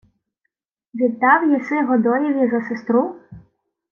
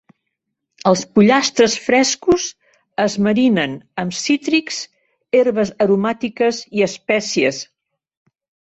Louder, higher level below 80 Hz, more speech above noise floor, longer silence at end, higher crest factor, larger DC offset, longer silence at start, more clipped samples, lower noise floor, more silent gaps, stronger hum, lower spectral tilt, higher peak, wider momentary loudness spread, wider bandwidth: about the same, -18 LUFS vs -17 LUFS; second, -64 dBFS vs -56 dBFS; about the same, 59 dB vs 60 dB; second, 0.5 s vs 1 s; about the same, 18 dB vs 16 dB; neither; about the same, 0.95 s vs 0.85 s; neither; about the same, -77 dBFS vs -76 dBFS; neither; neither; first, -8.5 dB/octave vs -4 dB/octave; about the same, -2 dBFS vs -2 dBFS; second, 8 LU vs 12 LU; second, 6.6 kHz vs 8.2 kHz